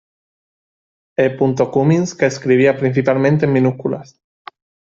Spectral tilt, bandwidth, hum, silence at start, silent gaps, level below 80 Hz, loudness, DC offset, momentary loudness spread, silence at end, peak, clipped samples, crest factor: -7 dB/octave; 7.8 kHz; none; 1.2 s; none; -56 dBFS; -16 LUFS; under 0.1%; 9 LU; 0.9 s; 0 dBFS; under 0.1%; 16 dB